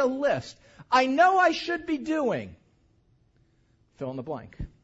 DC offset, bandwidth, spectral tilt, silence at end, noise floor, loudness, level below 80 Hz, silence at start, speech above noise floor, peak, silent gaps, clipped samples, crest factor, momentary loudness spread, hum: under 0.1%; 8 kHz; -5 dB/octave; 0.15 s; -65 dBFS; -25 LUFS; -54 dBFS; 0 s; 39 dB; -8 dBFS; none; under 0.1%; 20 dB; 18 LU; none